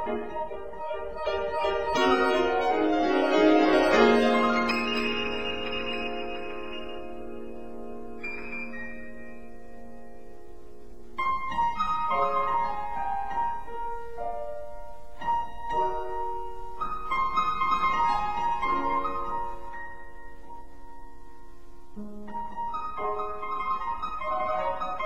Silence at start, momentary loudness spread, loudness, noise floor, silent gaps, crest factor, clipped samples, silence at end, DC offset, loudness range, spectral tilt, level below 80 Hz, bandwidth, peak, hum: 0 s; 20 LU; -28 LUFS; -49 dBFS; none; 20 dB; under 0.1%; 0 s; 2%; 17 LU; -4.5 dB/octave; -48 dBFS; 16.5 kHz; -8 dBFS; none